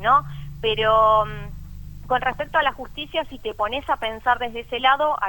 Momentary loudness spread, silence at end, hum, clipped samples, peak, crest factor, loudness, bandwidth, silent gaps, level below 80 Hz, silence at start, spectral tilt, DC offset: 18 LU; 0 s; none; under 0.1%; -4 dBFS; 18 dB; -22 LUFS; 18.5 kHz; none; -40 dBFS; 0 s; -5 dB/octave; under 0.1%